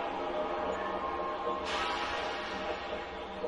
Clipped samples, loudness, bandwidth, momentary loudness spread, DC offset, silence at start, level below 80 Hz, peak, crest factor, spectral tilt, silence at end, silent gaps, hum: under 0.1%; -35 LUFS; 11.5 kHz; 5 LU; under 0.1%; 0 s; -56 dBFS; -22 dBFS; 14 dB; -4 dB/octave; 0 s; none; none